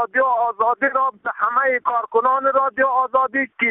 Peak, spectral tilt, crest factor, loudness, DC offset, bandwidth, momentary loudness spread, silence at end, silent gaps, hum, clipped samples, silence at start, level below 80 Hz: -6 dBFS; -8.5 dB/octave; 14 dB; -19 LUFS; under 0.1%; 3.9 kHz; 3 LU; 0 s; none; none; under 0.1%; 0 s; -66 dBFS